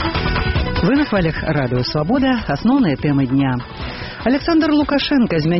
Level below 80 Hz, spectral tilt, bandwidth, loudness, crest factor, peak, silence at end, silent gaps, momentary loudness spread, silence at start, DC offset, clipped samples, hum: -30 dBFS; -5 dB/octave; 6 kHz; -17 LUFS; 10 dB; -6 dBFS; 0 s; none; 5 LU; 0 s; 0.2%; under 0.1%; none